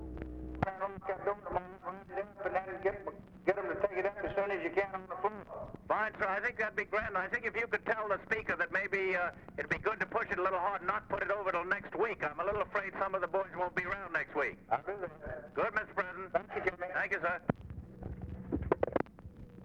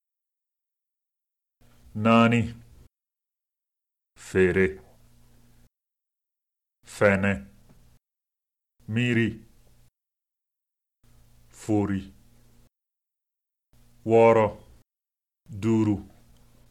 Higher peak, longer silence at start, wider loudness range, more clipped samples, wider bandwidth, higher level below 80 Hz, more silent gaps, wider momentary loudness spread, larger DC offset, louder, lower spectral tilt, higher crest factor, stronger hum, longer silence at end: second, -14 dBFS vs -6 dBFS; second, 0 s vs 1.95 s; second, 3 LU vs 9 LU; neither; second, 9.2 kHz vs 13 kHz; about the same, -56 dBFS vs -56 dBFS; neither; second, 10 LU vs 20 LU; neither; second, -36 LUFS vs -24 LUFS; about the same, -7 dB/octave vs -7 dB/octave; about the same, 22 dB vs 22 dB; neither; second, 0 s vs 0.65 s